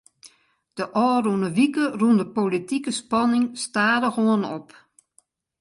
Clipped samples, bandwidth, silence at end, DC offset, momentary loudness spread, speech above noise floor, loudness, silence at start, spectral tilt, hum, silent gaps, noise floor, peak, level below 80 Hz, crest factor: under 0.1%; 11.5 kHz; 1 s; under 0.1%; 7 LU; 42 dB; -22 LUFS; 0.25 s; -5 dB/octave; none; none; -63 dBFS; -6 dBFS; -68 dBFS; 16 dB